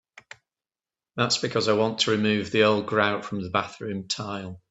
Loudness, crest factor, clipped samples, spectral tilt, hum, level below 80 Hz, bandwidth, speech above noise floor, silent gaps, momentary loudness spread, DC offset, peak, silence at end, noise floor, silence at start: -24 LUFS; 20 dB; under 0.1%; -4 dB/octave; none; -64 dBFS; 8.4 kHz; over 65 dB; none; 12 LU; under 0.1%; -6 dBFS; 0.15 s; under -90 dBFS; 1.15 s